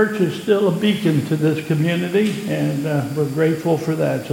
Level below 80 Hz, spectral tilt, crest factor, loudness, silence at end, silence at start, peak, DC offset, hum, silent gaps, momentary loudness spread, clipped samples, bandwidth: -60 dBFS; -7 dB/octave; 14 dB; -19 LUFS; 0 s; 0 s; -4 dBFS; under 0.1%; none; none; 4 LU; under 0.1%; 17 kHz